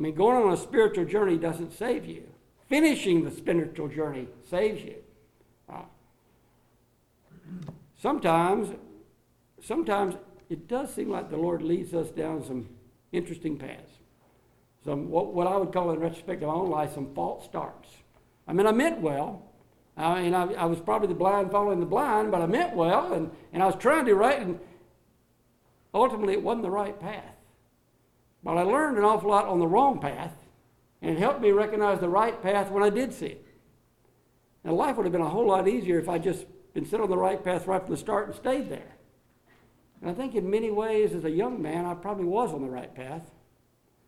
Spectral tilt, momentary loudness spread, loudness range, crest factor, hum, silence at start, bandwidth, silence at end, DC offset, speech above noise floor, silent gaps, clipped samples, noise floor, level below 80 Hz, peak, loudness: -6 dB/octave; 16 LU; 7 LU; 20 dB; none; 0 s; 14.5 kHz; 0.8 s; under 0.1%; 40 dB; none; under 0.1%; -66 dBFS; -60 dBFS; -8 dBFS; -27 LUFS